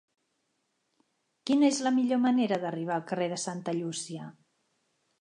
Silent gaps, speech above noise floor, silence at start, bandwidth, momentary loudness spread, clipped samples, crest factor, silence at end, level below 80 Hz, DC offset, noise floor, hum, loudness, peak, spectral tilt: none; 49 dB; 1.45 s; 11 kHz; 15 LU; under 0.1%; 18 dB; 0.9 s; -84 dBFS; under 0.1%; -78 dBFS; none; -29 LUFS; -14 dBFS; -4.5 dB/octave